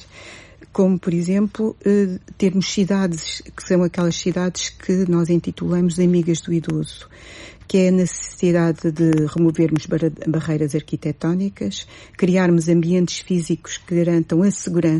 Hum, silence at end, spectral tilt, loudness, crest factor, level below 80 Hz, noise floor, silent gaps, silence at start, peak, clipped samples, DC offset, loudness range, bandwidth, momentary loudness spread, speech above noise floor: none; 0 s; -6.5 dB/octave; -19 LUFS; 12 dB; -50 dBFS; -41 dBFS; none; 0 s; -6 dBFS; under 0.1%; under 0.1%; 1 LU; 11.5 kHz; 10 LU; 22 dB